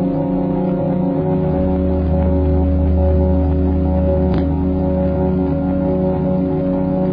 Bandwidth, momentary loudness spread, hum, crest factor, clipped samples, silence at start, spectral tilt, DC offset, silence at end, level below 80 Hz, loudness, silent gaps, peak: 4.4 kHz; 2 LU; none; 12 dB; under 0.1%; 0 s; -13 dB/octave; under 0.1%; 0 s; -22 dBFS; -17 LUFS; none; -4 dBFS